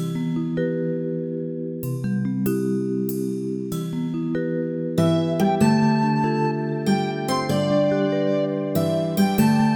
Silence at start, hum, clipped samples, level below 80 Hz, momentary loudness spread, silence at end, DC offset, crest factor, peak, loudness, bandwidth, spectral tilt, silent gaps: 0 s; none; under 0.1%; -56 dBFS; 9 LU; 0 s; under 0.1%; 16 dB; -6 dBFS; -23 LUFS; 19 kHz; -7 dB/octave; none